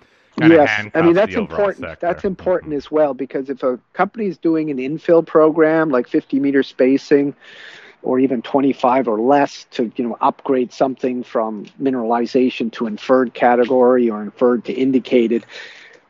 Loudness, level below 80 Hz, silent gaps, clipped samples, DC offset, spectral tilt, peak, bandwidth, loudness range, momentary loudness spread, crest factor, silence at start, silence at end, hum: -17 LUFS; -56 dBFS; none; under 0.1%; under 0.1%; -7 dB/octave; 0 dBFS; 7.4 kHz; 3 LU; 10 LU; 16 dB; 0.35 s; 0.35 s; none